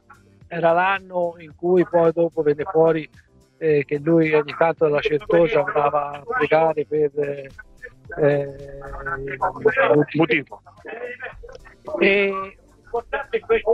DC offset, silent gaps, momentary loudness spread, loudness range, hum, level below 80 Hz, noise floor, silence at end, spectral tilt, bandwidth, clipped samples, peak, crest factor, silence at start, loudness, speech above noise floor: under 0.1%; none; 17 LU; 4 LU; none; -50 dBFS; -50 dBFS; 0 s; -8 dB/octave; 6.2 kHz; under 0.1%; -4 dBFS; 18 dB; 0.5 s; -20 LUFS; 30 dB